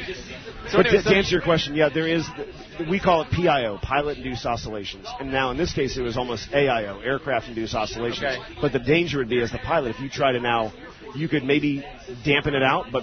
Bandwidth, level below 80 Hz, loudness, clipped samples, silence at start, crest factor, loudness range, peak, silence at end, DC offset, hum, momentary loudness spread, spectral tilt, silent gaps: 6.6 kHz; -42 dBFS; -23 LUFS; under 0.1%; 0 s; 22 dB; 4 LU; -2 dBFS; 0 s; under 0.1%; none; 13 LU; -5.5 dB/octave; none